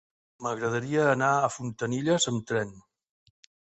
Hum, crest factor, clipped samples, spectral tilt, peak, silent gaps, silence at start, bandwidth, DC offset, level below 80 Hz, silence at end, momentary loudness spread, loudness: none; 18 dB; under 0.1%; -4.5 dB/octave; -10 dBFS; none; 0.4 s; 8.4 kHz; under 0.1%; -66 dBFS; 1 s; 10 LU; -27 LUFS